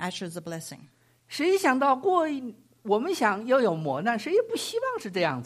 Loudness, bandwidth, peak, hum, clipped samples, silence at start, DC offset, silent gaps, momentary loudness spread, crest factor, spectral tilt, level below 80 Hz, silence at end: -26 LUFS; 15.5 kHz; -8 dBFS; none; under 0.1%; 0 s; under 0.1%; none; 15 LU; 18 dB; -4.5 dB/octave; -76 dBFS; 0 s